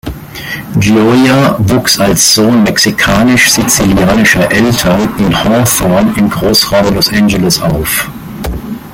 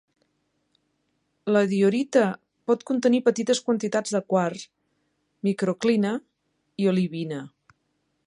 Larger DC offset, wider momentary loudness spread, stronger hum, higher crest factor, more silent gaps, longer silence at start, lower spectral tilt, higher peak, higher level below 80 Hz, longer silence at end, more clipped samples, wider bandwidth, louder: neither; about the same, 14 LU vs 13 LU; neither; second, 8 dB vs 18 dB; neither; second, 0.05 s vs 1.45 s; second, -4 dB/octave vs -5.5 dB/octave; first, 0 dBFS vs -6 dBFS; first, -28 dBFS vs -72 dBFS; second, 0 s vs 0.8 s; neither; first, 17.5 kHz vs 11 kHz; first, -8 LUFS vs -24 LUFS